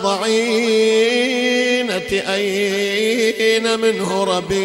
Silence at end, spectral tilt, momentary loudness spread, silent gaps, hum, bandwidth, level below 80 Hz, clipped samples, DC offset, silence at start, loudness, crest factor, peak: 0 s; -3.5 dB/octave; 4 LU; none; none; 16 kHz; -52 dBFS; under 0.1%; under 0.1%; 0 s; -17 LUFS; 14 dB; -4 dBFS